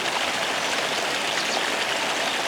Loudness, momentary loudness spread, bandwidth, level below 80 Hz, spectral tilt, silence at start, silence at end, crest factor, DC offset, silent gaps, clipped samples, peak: -23 LUFS; 1 LU; over 20 kHz; -64 dBFS; -0.5 dB/octave; 0 s; 0 s; 14 dB; under 0.1%; none; under 0.1%; -10 dBFS